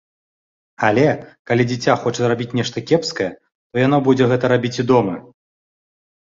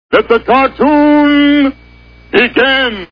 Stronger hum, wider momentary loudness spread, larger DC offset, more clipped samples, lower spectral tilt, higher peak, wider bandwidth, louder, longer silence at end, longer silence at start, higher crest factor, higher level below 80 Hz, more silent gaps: neither; first, 10 LU vs 4 LU; neither; second, under 0.1% vs 0.5%; about the same, -6 dB/octave vs -6.5 dB/octave; about the same, -2 dBFS vs 0 dBFS; first, 7.8 kHz vs 5.4 kHz; second, -18 LUFS vs -9 LUFS; first, 1.05 s vs 0.05 s; first, 0.8 s vs 0.1 s; first, 18 dB vs 10 dB; second, -54 dBFS vs -38 dBFS; first, 1.39-1.45 s, 3.55-3.70 s vs none